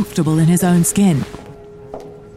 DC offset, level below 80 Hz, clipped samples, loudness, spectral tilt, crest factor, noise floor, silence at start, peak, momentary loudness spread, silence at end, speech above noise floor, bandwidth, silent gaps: under 0.1%; -44 dBFS; under 0.1%; -14 LUFS; -6 dB/octave; 12 dB; -36 dBFS; 0 s; -4 dBFS; 21 LU; 0.1 s; 22 dB; 15.5 kHz; none